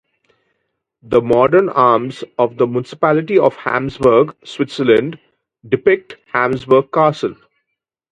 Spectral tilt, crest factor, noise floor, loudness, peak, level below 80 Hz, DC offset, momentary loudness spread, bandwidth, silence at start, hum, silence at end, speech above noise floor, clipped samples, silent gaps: -7 dB/octave; 16 dB; -77 dBFS; -15 LUFS; 0 dBFS; -52 dBFS; under 0.1%; 10 LU; 9.2 kHz; 1.1 s; none; 0.8 s; 62 dB; under 0.1%; none